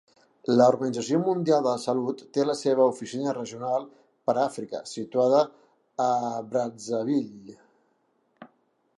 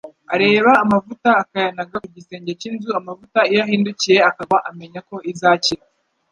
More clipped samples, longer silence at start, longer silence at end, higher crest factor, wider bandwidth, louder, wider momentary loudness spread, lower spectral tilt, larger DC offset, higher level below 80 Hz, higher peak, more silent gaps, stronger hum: neither; first, 0.5 s vs 0.05 s; about the same, 0.55 s vs 0.55 s; about the same, 20 dB vs 16 dB; first, 11.5 kHz vs 10 kHz; second, -26 LUFS vs -17 LUFS; second, 11 LU vs 17 LU; first, -6 dB/octave vs -4.5 dB/octave; neither; second, -78 dBFS vs -60 dBFS; second, -8 dBFS vs -2 dBFS; neither; neither